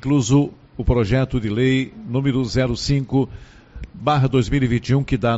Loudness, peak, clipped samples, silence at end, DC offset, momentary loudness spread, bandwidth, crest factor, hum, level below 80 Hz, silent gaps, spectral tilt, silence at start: -20 LUFS; -2 dBFS; under 0.1%; 0 s; under 0.1%; 8 LU; 8 kHz; 16 dB; none; -34 dBFS; none; -6.5 dB/octave; 0.05 s